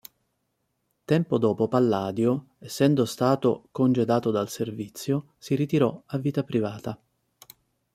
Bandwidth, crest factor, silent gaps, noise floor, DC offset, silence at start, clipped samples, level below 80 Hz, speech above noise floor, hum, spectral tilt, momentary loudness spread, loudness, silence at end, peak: 16 kHz; 20 dB; none; -76 dBFS; under 0.1%; 1.1 s; under 0.1%; -66 dBFS; 51 dB; none; -7 dB/octave; 9 LU; -25 LUFS; 1 s; -6 dBFS